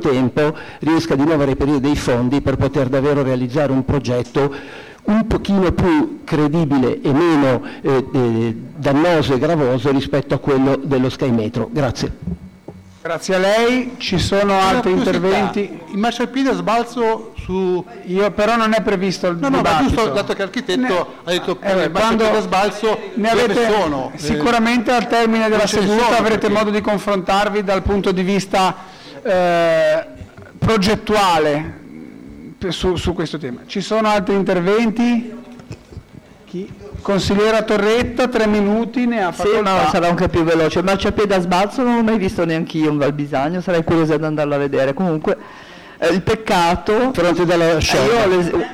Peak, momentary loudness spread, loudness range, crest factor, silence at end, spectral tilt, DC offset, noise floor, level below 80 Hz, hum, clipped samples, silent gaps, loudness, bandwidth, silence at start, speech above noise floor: -10 dBFS; 9 LU; 3 LU; 8 dB; 0 s; -6 dB/octave; 0.2%; -42 dBFS; -38 dBFS; none; under 0.1%; none; -17 LUFS; 16 kHz; 0 s; 25 dB